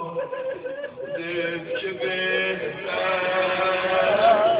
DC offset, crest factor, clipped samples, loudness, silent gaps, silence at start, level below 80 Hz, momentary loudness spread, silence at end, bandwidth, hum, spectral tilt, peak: under 0.1%; 16 dB; under 0.1%; -24 LUFS; none; 0 s; -62 dBFS; 12 LU; 0 s; 4 kHz; none; -8 dB/octave; -6 dBFS